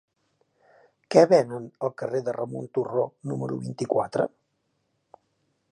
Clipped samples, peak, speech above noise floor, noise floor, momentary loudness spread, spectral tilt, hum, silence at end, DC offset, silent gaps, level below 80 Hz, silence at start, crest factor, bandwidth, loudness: under 0.1%; -4 dBFS; 50 dB; -74 dBFS; 13 LU; -6.5 dB/octave; none; 1.45 s; under 0.1%; none; -72 dBFS; 1.1 s; 24 dB; 11 kHz; -25 LUFS